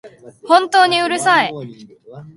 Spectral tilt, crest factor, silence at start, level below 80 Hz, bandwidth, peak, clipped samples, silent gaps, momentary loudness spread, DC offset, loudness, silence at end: -3 dB/octave; 16 dB; 0.05 s; -66 dBFS; 11.5 kHz; 0 dBFS; under 0.1%; none; 16 LU; under 0.1%; -14 LUFS; 0.05 s